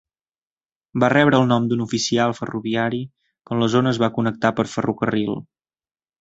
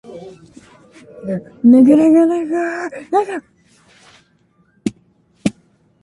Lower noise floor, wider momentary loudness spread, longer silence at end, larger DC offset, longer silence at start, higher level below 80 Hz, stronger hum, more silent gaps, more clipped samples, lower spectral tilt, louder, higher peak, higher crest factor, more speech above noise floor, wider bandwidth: first, under -90 dBFS vs -57 dBFS; second, 11 LU vs 19 LU; first, 0.8 s vs 0.5 s; neither; first, 0.95 s vs 0.1 s; about the same, -56 dBFS vs -58 dBFS; neither; neither; neither; second, -5.5 dB/octave vs -7 dB/octave; second, -20 LUFS vs -15 LUFS; about the same, -2 dBFS vs -2 dBFS; about the same, 20 dB vs 16 dB; first, over 70 dB vs 44 dB; second, 8 kHz vs 11.5 kHz